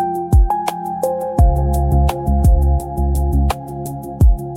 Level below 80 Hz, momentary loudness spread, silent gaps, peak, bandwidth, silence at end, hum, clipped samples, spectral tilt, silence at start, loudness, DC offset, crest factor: -16 dBFS; 8 LU; none; -2 dBFS; 15.5 kHz; 0 s; none; under 0.1%; -8 dB/octave; 0 s; -17 LUFS; under 0.1%; 12 dB